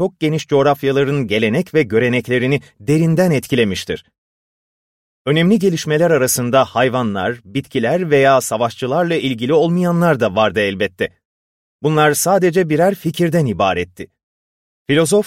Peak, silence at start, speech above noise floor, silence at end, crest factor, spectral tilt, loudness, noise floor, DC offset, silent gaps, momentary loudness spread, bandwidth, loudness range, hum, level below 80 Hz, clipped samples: -2 dBFS; 0 s; over 75 dB; 0 s; 14 dB; -5.5 dB/octave; -16 LUFS; under -90 dBFS; under 0.1%; 4.18-5.25 s, 11.25-11.79 s, 14.23-14.85 s; 9 LU; 16.5 kHz; 2 LU; none; -52 dBFS; under 0.1%